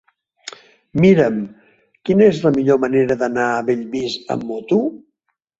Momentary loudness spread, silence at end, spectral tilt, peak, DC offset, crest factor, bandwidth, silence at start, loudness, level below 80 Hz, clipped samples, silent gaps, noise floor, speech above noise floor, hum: 18 LU; 0.6 s; -7 dB/octave; -2 dBFS; under 0.1%; 16 dB; 7.8 kHz; 0.45 s; -17 LUFS; -54 dBFS; under 0.1%; none; -72 dBFS; 56 dB; none